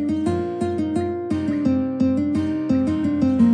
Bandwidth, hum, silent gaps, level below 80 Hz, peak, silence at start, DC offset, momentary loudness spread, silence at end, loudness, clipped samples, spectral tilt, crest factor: 10 kHz; none; none; -50 dBFS; -8 dBFS; 0 s; under 0.1%; 4 LU; 0 s; -22 LUFS; under 0.1%; -8.5 dB/octave; 14 dB